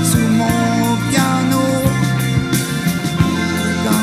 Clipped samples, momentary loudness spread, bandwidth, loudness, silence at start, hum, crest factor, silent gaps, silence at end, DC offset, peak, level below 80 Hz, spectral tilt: under 0.1%; 3 LU; 16 kHz; -16 LUFS; 0 s; none; 14 dB; none; 0 s; under 0.1%; 0 dBFS; -36 dBFS; -5 dB/octave